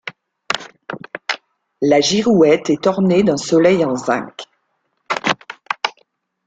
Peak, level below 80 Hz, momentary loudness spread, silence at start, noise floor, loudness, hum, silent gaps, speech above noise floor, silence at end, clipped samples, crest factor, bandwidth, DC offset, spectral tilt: 0 dBFS; -58 dBFS; 16 LU; 0.05 s; -68 dBFS; -17 LUFS; none; none; 54 dB; 0.55 s; under 0.1%; 18 dB; 9.2 kHz; under 0.1%; -5 dB/octave